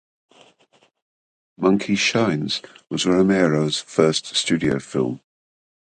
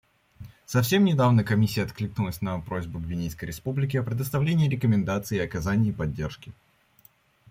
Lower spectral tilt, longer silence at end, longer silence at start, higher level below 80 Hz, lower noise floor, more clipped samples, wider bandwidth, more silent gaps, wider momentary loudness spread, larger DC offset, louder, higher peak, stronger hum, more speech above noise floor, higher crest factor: second, -4.5 dB/octave vs -6.5 dB/octave; second, 0.75 s vs 1 s; first, 1.6 s vs 0.4 s; second, -56 dBFS vs -50 dBFS; about the same, -60 dBFS vs -60 dBFS; neither; second, 9.6 kHz vs 16.5 kHz; neither; second, 9 LU vs 12 LU; neither; first, -20 LUFS vs -26 LUFS; first, -2 dBFS vs -8 dBFS; neither; first, 40 dB vs 35 dB; about the same, 20 dB vs 18 dB